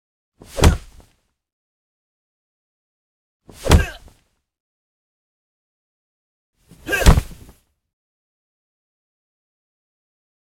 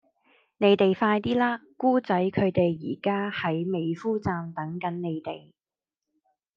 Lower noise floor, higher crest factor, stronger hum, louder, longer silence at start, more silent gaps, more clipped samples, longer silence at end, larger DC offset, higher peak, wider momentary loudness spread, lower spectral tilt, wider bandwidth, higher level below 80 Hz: second, -61 dBFS vs under -90 dBFS; about the same, 24 dB vs 20 dB; neither; first, -18 LUFS vs -26 LUFS; about the same, 0.55 s vs 0.6 s; first, 1.53-3.40 s, 4.60-6.53 s vs none; neither; first, 3.2 s vs 1.2 s; neither; first, 0 dBFS vs -8 dBFS; first, 18 LU vs 10 LU; second, -5 dB/octave vs -8.5 dB/octave; first, 17 kHz vs 7 kHz; first, -28 dBFS vs -62 dBFS